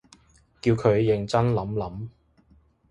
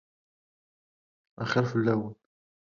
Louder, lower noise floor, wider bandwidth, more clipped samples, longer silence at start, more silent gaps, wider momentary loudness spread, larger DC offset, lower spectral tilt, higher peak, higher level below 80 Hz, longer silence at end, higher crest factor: first, -24 LUFS vs -28 LUFS; second, -60 dBFS vs under -90 dBFS; first, 10.5 kHz vs 7.2 kHz; neither; second, 0.65 s vs 1.4 s; neither; first, 15 LU vs 11 LU; neither; about the same, -7.5 dB/octave vs -7 dB/octave; first, -6 dBFS vs -12 dBFS; first, -50 dBFS vs -68 dBFS; first, 0.8 s vs 0.6 s; about the same, 20 dB vs 22 dB